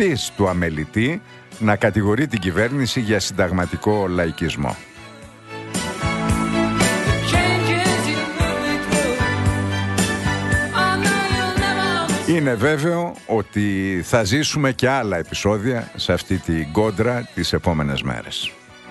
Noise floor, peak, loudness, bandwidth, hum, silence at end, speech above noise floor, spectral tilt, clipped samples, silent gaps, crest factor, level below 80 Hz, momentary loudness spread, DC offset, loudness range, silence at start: -40 dBFS; -2 dBFS; -20 LUFS; 12.5 kHz; none; 0 s; 20 dB; -5 dB/octave; under 0.1%; none; 18 dB; -38 dBFS; 7 LU; under 0.1%; 3 LU; 0 s